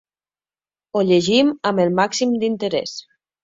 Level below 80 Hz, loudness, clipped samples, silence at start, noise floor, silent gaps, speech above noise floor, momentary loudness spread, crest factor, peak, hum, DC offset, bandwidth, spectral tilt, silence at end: -62 dBFS; -18 LUFS; under 0.1%; 0.95 s; under -90 dBFS; none; over 72 dB; 10 LU; 18 dB; -2 dBFS; 50 Hz at -70 dBFS; under 0.1%; 7.8 kHz; -5 dB/octave; 0.45 s